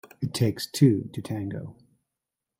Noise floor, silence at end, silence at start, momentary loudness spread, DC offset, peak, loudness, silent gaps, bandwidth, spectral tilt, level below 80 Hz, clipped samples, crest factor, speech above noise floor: -86 dBFS; 0.85 s; 0.2 s; 15 LU; under 0.1%; -6 dBFS; -26 LUFS; none; 16 kHz; -6.5 dB/octave; -60 dBFS; under 0.1%; 20 dB; 61 dB